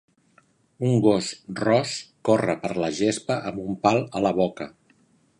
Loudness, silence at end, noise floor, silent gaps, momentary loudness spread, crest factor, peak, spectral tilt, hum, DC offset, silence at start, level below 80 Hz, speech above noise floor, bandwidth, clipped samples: -24 LUFS; 0.7 s; -61 dBFS; none; 10 LU; 22 dB; -2 dBFS; -5.5 dB/octave; none; under 0.1%; 0.8 s; -60 dBFS; 38 dB; 11 kHz; under 0.1%